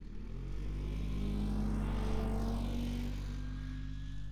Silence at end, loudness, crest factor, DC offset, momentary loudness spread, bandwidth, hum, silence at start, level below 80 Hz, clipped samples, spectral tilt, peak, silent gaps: 0 s; -40 LUFS; 14 dB; under 0.1%; 8 LU; 11.5 kHz; none; 0 s; -38 dBFS; under 0.1%; -7.5 dB/octave; -24 dBFS; none